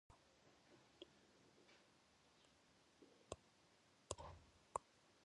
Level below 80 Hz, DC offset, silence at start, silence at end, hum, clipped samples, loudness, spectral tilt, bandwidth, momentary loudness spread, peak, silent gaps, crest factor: -74 dBFS; under 0.1%; 0.1 s; 0 s; none; under 0.1%; -57 LUFS; -3.5 dB/octave; 10.5 kHz; 12 LU; -26 dBFS; none; 36 dB